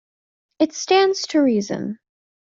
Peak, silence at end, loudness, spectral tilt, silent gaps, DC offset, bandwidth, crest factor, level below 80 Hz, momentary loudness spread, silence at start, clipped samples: -4 dBFS; 0.55 s; -19 LUFS; -4 dB/octave; none; under 0.1%; 7.6 kHz; 18 dB; -68 dBFS; 13 LU; 0.6 s; under 0.1%